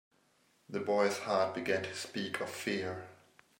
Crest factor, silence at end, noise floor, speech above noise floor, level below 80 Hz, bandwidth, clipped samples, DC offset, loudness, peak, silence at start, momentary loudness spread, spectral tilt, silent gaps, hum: 20 dB; 0.45 s; -71 dBFS; 37 dB; -80 dBFS; 16 kHz; under 0.1%; under 0.1%; -35 LUFS; -18 dBFS; 0.7 s; 11 LU; -4 dB/octave; none; none